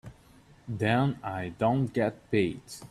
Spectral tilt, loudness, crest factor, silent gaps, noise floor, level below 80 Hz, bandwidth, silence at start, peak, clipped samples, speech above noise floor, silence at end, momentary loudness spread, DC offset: -7 dB/octave; -29 LUFS; 18 dB; none; -57 dBFS; -58 dBFS; 13 kHz; 0.05 s; -12 dBFS; under 0.1%; 28 dB; 0.05 s; 13 LU; under 0.1%